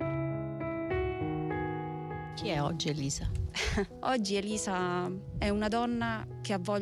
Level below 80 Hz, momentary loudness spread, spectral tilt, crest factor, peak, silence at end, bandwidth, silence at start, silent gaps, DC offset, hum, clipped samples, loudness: -46 dBFS; 6 LU; -5 dB/octave; 12 dB; -20 dBFS; 0 s; 13.5 kHz; 0 s; none; under 0.1%; none; under 0.1%; -33 LUFS